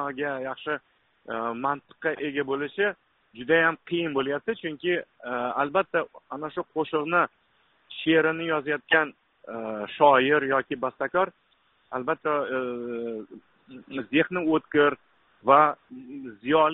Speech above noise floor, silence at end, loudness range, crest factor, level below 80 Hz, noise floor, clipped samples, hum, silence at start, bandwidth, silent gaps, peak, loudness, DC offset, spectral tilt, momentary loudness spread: 40 dB; 0 s; 6 LU; 22 dB; -68 dBFS; -66 dBFS; under 0.1%; none; 0 s; 4.1 kHz; none; -4 dBFS; -26 LUFS; under 0.1%; -2.5 dB/octave; 15 LU